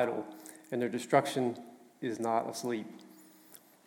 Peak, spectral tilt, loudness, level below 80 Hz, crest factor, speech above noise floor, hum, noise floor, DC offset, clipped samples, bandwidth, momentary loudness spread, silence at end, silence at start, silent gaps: -12 dBFS; -5 dB/octave; -34 LUFS; -90 dBFS; 22 dB; 25 dB; none; -58 dBFS; under 0.1%; under 0.1%; 17.5 kHz; 24 LU; 0.3 s; 0 s; none